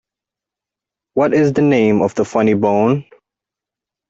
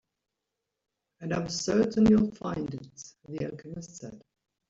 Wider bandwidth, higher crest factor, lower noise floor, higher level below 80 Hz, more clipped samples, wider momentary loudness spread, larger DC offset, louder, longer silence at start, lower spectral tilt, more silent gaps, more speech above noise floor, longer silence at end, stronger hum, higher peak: about the same, 8 kHz vs 7.8 kHz; about the same, 14 dB vs 18 dB; about the same, -86 dBFS vs -85 dBFS; about the same, -54 dBFS vs -56 dBFS; neither; second, 5 LU vs 22 LU; neither; first, -15 LUFS vs -28 LUFS; about the same, 1.15 s vs 1.2 s; first, -7.5 dB/octave vs -6 dB/octave; neither; first, 72 dB vs 57 dB; first, 1.05 s vs 0.5 s; neither; first, -2 dBFS vs -12 dBFS